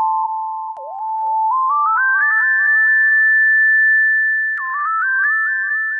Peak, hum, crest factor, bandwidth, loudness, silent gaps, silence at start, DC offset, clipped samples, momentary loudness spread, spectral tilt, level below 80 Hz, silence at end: -8 dBFS; none; 8 dB; 2.4 kHz; -14 LUFS; none; 0 s; under 0.1%; under 0.1%; 12 LU; -1 dB/octave; under -90 dBFS; 0 s